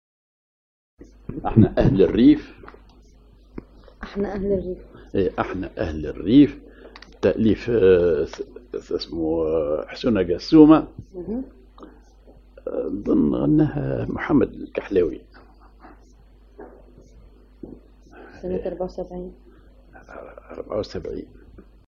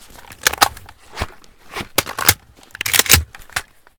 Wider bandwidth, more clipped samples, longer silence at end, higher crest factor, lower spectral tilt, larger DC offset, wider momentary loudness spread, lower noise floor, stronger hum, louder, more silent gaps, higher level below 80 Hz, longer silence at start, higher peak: second, 6.6 kHz vs over 20 kHz; neither; about the same, 0.3 s vs 0.35 s; about the same, 22 dB vs 20 dB; first, -8.5 dB/octave vs -1 dB/octave; neither; first, 24 LU vs 18 LU; first, -50 dBFS vs -40 dBFS; neither; second, -21 LUFS vs -16 LUFS; neither; second, -42 dBFS vs -36 dBFS; first, 1.3 s vs 0.3 s; about the same, 0 dBFS vs 0 dBFS